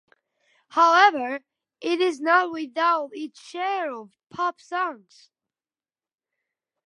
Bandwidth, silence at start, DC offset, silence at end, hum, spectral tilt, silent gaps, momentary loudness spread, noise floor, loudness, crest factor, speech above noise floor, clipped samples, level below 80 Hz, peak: 11 kHz; 0.75 s; under 0.1%; 1.9 s; none; -2.5 dB/octave; none; 17 LU; under -90 dBFS; -23 LUFS; 22 dB; over 67 dB; under 0.1%; -82 dBFS; -4 dBFS